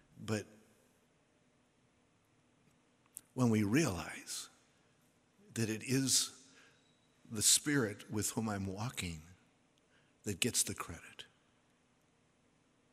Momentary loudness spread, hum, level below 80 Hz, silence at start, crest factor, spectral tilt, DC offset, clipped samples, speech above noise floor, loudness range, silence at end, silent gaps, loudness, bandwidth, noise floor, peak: 21 LU; none; -68 dBFS; 0.2 s; 24 dB; -3 dB/octave; under 0.1%; under 0.1%; 38 dB; 7 LU; 1.7 s; none; -35 LUFS; 16 kHz; -73 dBFS; -14 dBFS